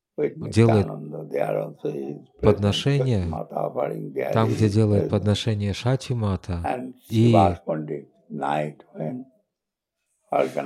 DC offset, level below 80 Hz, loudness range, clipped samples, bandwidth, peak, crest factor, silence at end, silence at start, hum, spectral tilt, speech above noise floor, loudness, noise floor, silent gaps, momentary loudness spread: under 0.1%; -52 dBFS; 3 LU; under 0.1%; 13 kHz; -4 dBFS; 20 dB; 0 s; 0.2 s; none; -7 dB/octave; 61 dB; -24 LUFS; -84 dBFS; none; 14 LU